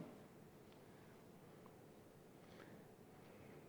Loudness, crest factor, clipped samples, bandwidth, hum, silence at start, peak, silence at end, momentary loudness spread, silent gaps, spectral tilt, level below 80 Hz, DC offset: -62 LUFS; 20 dB; under 0.1%; over 20 kHz; none; 0 s; -42 dBFS; 0 s; 3 LU; none; -6 dB/octave; -82 dBFS; under 0.1%